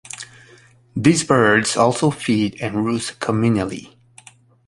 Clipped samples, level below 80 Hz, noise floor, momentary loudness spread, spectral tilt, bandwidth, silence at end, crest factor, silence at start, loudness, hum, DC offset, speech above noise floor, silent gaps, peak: under 0.1%; -52 dBFS; -50 dBFS; 18 LU; -5 dB/octave; 11.5 kHz; 0.8 s; 18 dB; 0.15 s; -18 LUFS; none; under 0.1%; 32 dB; none; -2 dBFS